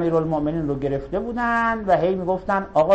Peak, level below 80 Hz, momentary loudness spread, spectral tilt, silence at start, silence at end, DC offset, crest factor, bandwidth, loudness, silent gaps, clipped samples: -6 dBFS; -42 dBFS; 5 LU; -8 dB/octave; 0 s; 0 s; under 0.1%; 14 dB; 8.6 kHz; -22 LUFS; none; under 0.1%